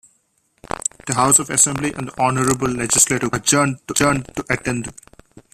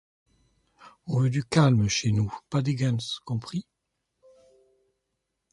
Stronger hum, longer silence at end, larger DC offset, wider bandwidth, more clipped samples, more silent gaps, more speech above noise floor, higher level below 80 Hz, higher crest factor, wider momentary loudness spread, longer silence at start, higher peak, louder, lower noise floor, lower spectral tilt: neither; second, 0.15 s vs 1.9 s; neither; first, 15 kHz vs 11 kHz; neither; neither; second, 45 dB vs 56 dB; first, -46 dBFS vs -54 dBFS; about the same, 20 dB vs 20 dB; about the same, 11 LU vs 11 LU; first, 1.05 s vs 0.85 s; first, 0 dBFS vs -8 dBFS; first, -17 LUFS vs -26 LUFS; second, -64 dBFS vs -81 dBFS; second, -3 dB/octave vs -5.5 dB/octave